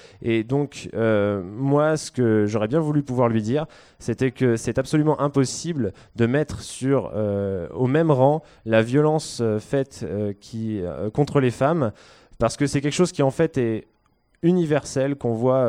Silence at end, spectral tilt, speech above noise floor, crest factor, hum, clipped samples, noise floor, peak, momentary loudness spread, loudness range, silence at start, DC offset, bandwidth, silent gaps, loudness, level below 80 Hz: 0 s; -6.5 dB/octave; 43 dB; 18 dB; none; under 0.1%; -64 dBFS; -4 dBFS; 8 LU; 2 LU; 0.2 s; under 0.1%; 12 kHz; none; -22 LUFS; -52 dBFS